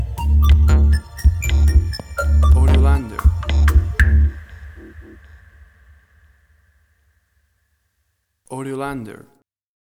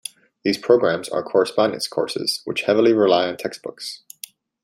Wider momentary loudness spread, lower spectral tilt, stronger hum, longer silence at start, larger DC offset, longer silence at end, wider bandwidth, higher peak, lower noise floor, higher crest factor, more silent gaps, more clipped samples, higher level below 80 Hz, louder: about the same, 19 LU vs 18 LU; first, -6.5 dB/octave vs -4 dB/octave; neither; second, 0 s vs 0.45 s; neither; first, 0.85 s vs 0.65 s; about the same, 15 kHz vs 16 kHz; about the same, -2 dBFS vs -2 dBFS; first, -69 dBFS vs -43 dBFS; about the same, 16 dB vs 18 dB; neither; neither; first, -18 dBFS vs -66 dBFS; first, -17 LUFS vs -20 LUFS